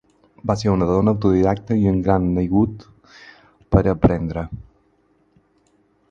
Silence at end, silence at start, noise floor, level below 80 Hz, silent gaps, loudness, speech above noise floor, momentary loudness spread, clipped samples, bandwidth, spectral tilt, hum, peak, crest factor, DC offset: 1.5 s; 0.45 s; -61 dBFS; -36 dBFS; none; -19 LUFS; 43 dB; 12 LU; under 0.1%; 7.6 kHz; -9 dB/octave; none; 0 dBFS; 20 dB; under 0.1%